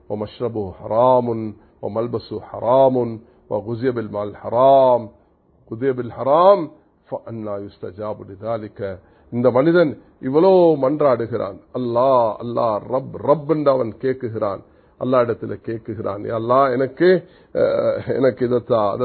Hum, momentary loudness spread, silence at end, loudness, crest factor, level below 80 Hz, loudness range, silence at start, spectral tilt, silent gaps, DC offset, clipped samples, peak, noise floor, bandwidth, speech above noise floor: none; 16 LU; 0 s; -19 LUFS; 18 dB; -54 dBFS; 4 LU; 0.1 s; -12 dB/octave; none; under 0.1%; under 0.1%; 0 dBFS; -55 dBFS; 4.5 kHz; 36 dB